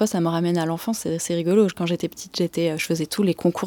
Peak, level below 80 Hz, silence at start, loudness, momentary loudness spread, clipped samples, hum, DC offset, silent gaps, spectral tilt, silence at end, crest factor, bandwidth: -6 dBFS; -62 dBFS; 0 s; -23 LUFS; 6 LU; under 0.1%; none; under 0.1%; none; -5.5 dB/octave; 0 s; 16 dB; 19 kHz